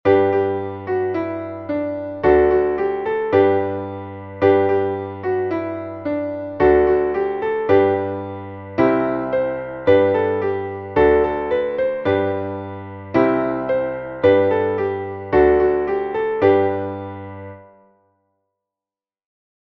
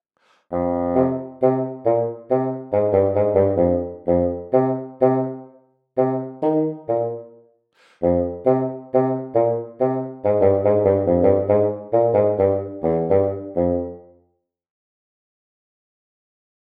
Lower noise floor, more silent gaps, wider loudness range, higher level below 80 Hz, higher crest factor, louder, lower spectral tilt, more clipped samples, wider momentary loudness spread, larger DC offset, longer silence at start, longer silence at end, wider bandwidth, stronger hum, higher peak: first, under -90 dBFS vs -68 dBFS; neither; second, 2 LU vs 6 LU; first, -42 dBFS vs -50 dBFS; about the same, 16 dB vs 18 dB; about the same, -19 LUFS vs -20 LUFS; second, -9 dB/octave vs -12 dB/octave; neither; first, 13 LU vs 7 LU; neither; second, 0.05 s vs 0.5 s; second, 2.05 s vs 2.65 s; first, 5.2 kHz vs 3.6 kHz; neither; about the same, -2 dBFS vs -2 dBFS